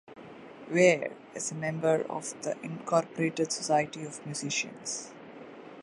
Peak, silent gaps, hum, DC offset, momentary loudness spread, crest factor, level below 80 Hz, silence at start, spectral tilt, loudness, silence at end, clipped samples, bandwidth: -8 dBFS; none; none; under 0.1%; 23 LU; 22 dB; -76 dBFS; 0.1 s; -4 dB/octave; -30 LUFS; 0 s; under 0.1%; 11.5 kHz